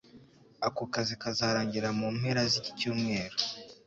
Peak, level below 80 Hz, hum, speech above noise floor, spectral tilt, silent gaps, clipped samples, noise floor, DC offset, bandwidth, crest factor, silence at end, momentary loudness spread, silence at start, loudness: -12 dBFS; -64 dBFS; none; 25 dB; -4.5 dB/octave; none; under 0.1%; -57 dBFS; under 0.1%; 8 kHz; 20 dB; 0.15 s; 5 LU; 0.15 s; -31 LUFS